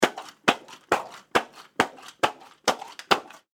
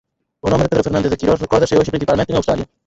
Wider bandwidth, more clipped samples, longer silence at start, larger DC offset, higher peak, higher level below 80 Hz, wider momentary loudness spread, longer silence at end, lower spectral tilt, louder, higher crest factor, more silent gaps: first, over 20 kHz vs 8 kHz; neither; second, 0 s vs 0.45 s; neither; about the same, 0 dBFS vs -2 dBFS; second, -64 dBFS vs -36 dBFS; about the same, 3 LU vs 4 LU; about the same, 0.3 s vs 0.25 s; second, -2.5 dB/octave vs -6.5 dB/octave; second, -27 LUFS vs -16 LUFS; first, 28 dB vs 14 dB; neither